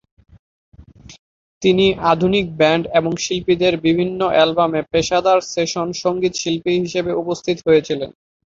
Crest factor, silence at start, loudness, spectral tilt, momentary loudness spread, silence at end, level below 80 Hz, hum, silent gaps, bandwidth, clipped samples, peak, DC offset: 16 dB; 1.1 s; -17 LUFS; -5 dB/octave; 6 LU; 0.35 s; -48 dBFS; none; 1.19-1.61 s; 7.8 kHz; under 0.1%; -2 dBFS; under 0.1%